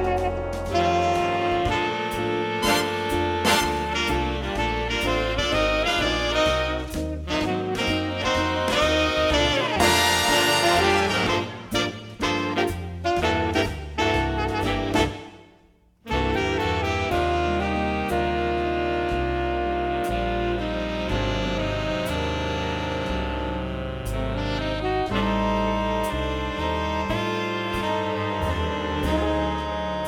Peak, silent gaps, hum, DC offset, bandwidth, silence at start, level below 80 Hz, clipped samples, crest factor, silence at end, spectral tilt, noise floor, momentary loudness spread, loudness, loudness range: -6 dBFS; none; none; under 0.1%; 19 kHz; 0 s; -34 dBFS; under 0.1%; 18 dB; 0 s; -4.5 dB/octave; -57 dBFS; 7 LU; -24 LUFS; 6 LU